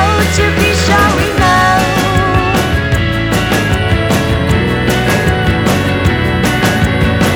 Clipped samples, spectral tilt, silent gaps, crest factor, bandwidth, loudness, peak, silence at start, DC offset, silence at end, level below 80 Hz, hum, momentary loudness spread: under 0.1%; -5 dB/octave; none; 10 dB; 19.5 kHz; -11 LUFS; 0 dBFS; 0 s; under 0.1%; 0 s; -22 dBFS; none; 3 LU